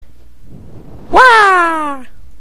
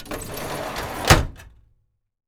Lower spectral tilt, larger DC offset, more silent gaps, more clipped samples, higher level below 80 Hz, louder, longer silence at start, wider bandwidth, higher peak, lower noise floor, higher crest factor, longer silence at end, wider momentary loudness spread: about the same, -3 dB/octave vs -4 dB/octave; neither; neither; first, 0.6% vs under 0.1%; about the same, -36 dBFS vs -32 dBFS; first, -8 LUFS vs -22 LUFS; first, 0.4 s vs 0 s; second, 14 kHz vs over 20 kHz; first, 0 dBFS vs -4 dBFS; second, -39 dBFS vs -66 dBFS; second, 12 dB vs 20 dB; second, 0.05 s vs 0.8 s; first, 17 LU vs 14 LU